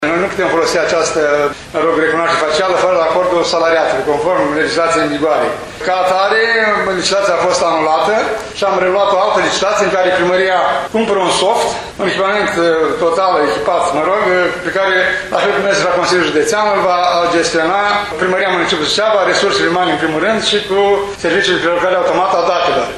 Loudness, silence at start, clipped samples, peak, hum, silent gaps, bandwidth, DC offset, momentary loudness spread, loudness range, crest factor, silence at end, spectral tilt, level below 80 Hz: -13 LUFS; 0 s; under 0.1%; 0 dBFS; none; none; 12.5 kHz; under 0.1%; 3 LU; 1 LU; 12 dB; 0 s; -3 dB/octave; -46 dBFS